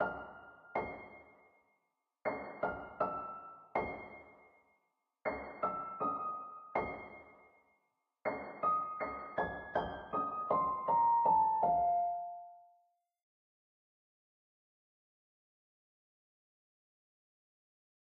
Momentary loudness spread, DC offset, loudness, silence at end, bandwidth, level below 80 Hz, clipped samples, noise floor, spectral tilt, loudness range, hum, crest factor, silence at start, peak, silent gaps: 20 LU; under 0.1%; -36 LUFS; 5.35 s; 5.2 kHz; -66 dBFS; under 0.1%; -84 dBFS; -4.5 dB/octave; 9 LU; none; 20 dB; 0 s; -20 dBFS; none